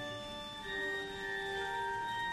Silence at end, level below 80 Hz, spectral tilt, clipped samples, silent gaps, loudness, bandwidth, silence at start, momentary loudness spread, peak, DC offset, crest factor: 0 s; -60 dBFS; -3 dB/octave; under 0.1%; none; -38 LUFS; 15 kHz; 0 s; 6 LU; -28 dBFS; under 0.1%; 12 dB